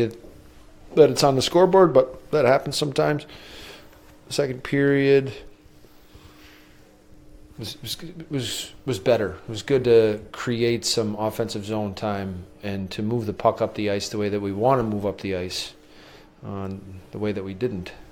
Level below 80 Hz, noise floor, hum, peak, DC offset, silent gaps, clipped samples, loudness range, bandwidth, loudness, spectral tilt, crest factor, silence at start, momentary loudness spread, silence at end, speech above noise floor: -52 dBFS; -51 dBFS; none; -2 dBFS; under 0.1%; none; under 0.1%; 9 LU; 17 kHz; -23 LUFS; -5 dB/octave; 22 dB; 0 s; 17 LU; 0.05 s; 28 dB